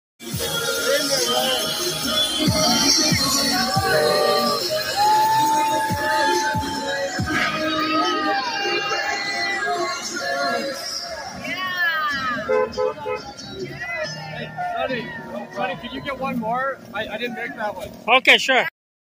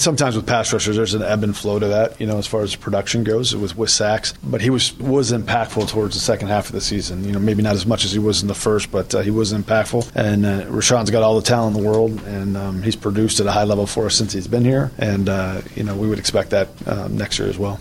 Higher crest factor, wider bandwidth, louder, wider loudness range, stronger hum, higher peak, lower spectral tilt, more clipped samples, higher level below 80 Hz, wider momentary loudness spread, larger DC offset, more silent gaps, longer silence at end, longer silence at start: first, 22 dB vs 16 dB; about the same, 16 kHz vs 16 kHz; about the same, -20 LUFS vs -19 LUFS; first, 9 LU vs 2 LU; neither; about the same, 0 dBFS vs -2 dBFS; second, -2.5 dB/octave vs -4.5 dB/octave; neither; second, -50 dBFS vs -40 dBFS; first, 12 LU vs 6 LU; neither; neither; first, 0.5 s vs 0 s; first, 0.2 s vs 0 s